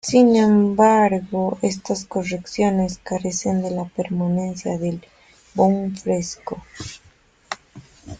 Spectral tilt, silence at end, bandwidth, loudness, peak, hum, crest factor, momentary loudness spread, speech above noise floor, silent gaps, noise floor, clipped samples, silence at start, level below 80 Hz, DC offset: -6 dB/octave; 0.05 s; 9.4 kHz; -20 LUFS; -2 dBFS; none; 18 dB; 19 LU; 35 dB; none; -55 dBFS; under 0.1%; 0.05 s; -52 dBFS; under 0.1%